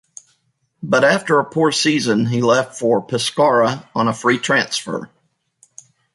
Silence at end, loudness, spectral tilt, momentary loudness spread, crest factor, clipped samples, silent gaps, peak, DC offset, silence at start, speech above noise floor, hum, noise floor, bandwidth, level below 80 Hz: 1.1 s; -17 LUFS; -4.5 dB/octave; 7 LU; 16 dB; under 0.1%; none; -2 dBFS; under 0.1%; 0.8 s; 49 dB; none; -66 dBFS; 11.5 kHz; -62 dBFS